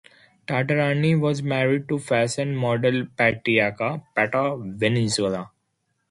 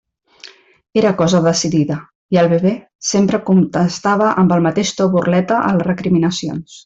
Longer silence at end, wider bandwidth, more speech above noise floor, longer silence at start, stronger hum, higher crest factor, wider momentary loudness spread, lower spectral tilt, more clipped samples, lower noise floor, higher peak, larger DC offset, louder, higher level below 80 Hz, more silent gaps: first, 0.65 s vs 0.05 s; first, 11.5 kHz vs 8 kHz; first, 51 dB vs 28 dB; about the same, 0.5 s vs 0.45 s; neither; first, 20 dB vs 12 dB; about the same, 7 LU vs 6 LU; about the same, -5.5 dB/octave vs -5.5 dB/octave; neither; first, -74 dBFS vs -42 dBFS; about the same, -4 dBFS vs -2 dBFS; neither; second, -23 LUFS vs -15 LUFS; second, -60 dBFS vs -52 dBFS; second, none vs 2.15-2.29 s, 2.95-2.99 s